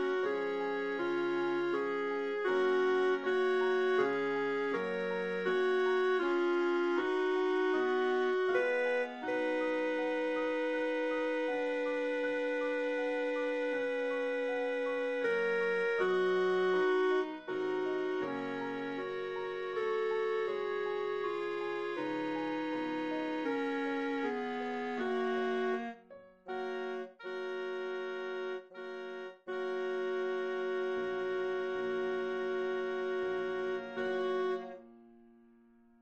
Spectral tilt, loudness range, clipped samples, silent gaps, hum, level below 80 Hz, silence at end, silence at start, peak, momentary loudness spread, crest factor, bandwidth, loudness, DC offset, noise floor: -5.5 dB/octave; 6 LU; under 0.1%; none; none; -78 dBFS; 0.75 s; 0 s; -18 dBFS; 8 LU; 16 dB; 8.2 kHz; -34 LUFS; under 0.1%; -63 dBFS